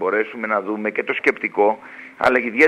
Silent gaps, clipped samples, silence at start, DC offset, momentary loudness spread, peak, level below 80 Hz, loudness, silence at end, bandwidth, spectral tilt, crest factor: none; under 0.1%; 0 s; under 0.1%; 5 LU; -2 dBFS; -60 dBFS; -20 LUFS; 0 s; 11.5 kHz; -5 dB/octave; 18 dB